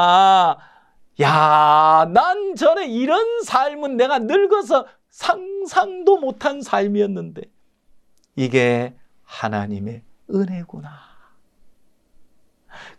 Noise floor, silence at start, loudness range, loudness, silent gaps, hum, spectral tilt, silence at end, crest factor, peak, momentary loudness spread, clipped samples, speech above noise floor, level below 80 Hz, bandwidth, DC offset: -53 dBFS; 0 s; 13 LU; -18 LUFS; none; none; -5.5 dB/octave; 0.1 s; 18 dB; -2 dBFS; 18 LU; under 0.1%; 35 dB; -64 dBFS; 11.5 kHz; under 0.1%